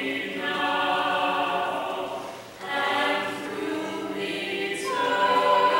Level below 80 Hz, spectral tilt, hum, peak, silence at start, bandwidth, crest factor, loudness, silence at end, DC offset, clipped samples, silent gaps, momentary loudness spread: -68 dBFS; -3 dB/octave; none; -10 dBFS; 0 s; 16 kHz; 16 dB; -26 LUFS; 0 s; under 0.1%; under 0.1%; none; 10 LU